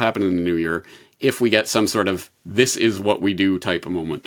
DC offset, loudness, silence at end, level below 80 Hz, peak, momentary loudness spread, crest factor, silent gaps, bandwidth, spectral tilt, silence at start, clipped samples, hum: under 0.1%; -20 LUFS; 0.05 s; -58 dBFS; -2 dBFS; 8 LU; 18 dB; none; 18 kHz; -4 dB/octave; 0 s; under 0.1%; none